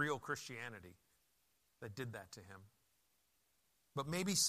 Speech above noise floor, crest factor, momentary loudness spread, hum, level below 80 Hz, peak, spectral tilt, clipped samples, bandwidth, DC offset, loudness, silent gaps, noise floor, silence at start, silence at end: 37 dB; 22 dB; 19 LU; none; -78 dBFS; -22 dBFS; -2.5 dB/octave; under 0.1%; 15 kHz; under 0.1%; -45 LUFS; none; -80 dBFS; 0 s; 0 s